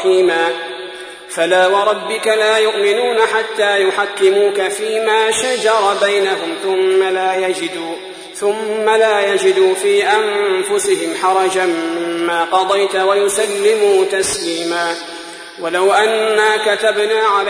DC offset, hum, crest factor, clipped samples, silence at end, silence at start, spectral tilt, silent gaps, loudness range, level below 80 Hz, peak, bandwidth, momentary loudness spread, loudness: under 0.1%; none; 14 dB; under 0.1%; 0 s; 0 s; -2 dB/octave; none; 2 LU; -58 dBFS; -2 dBFS; 11 kHz; 8 LU; -14 LUFS